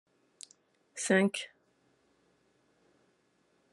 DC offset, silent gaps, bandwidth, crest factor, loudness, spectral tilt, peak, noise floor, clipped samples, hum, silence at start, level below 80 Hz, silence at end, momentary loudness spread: under 0.1%; none; 12 kHz; 24 dB; -30 LUFS; -4 dB/octave; -14 dBFS; -72 dBFS; under 0.1%; none; 0.95 s; -84 dBFS; 2.25 s; 24 LU